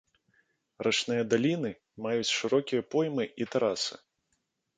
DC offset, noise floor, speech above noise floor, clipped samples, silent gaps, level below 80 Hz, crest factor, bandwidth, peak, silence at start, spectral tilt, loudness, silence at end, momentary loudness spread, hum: under 0.1%; -79 dBFS; 49 dB; under 0.1%; none; -72 dBFS; 20 dB; 9.6 kHz; -12 dBFS; 0.8 s; -4 dB/octave; -30 LUFS; 0.8 s; 7 LU; none